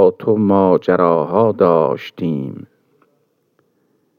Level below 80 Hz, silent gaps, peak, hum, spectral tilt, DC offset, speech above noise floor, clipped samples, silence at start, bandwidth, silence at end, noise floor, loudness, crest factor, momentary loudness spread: -68 dBFS; none; 0 dBFS; none; -9.5 dB/octave; under 0.1%; 49 dB; under 0.1%; 0 s; 6.4 kHz; 1.55 s; -63 dBFS; -15 LUFS; 16 dB; 10 LU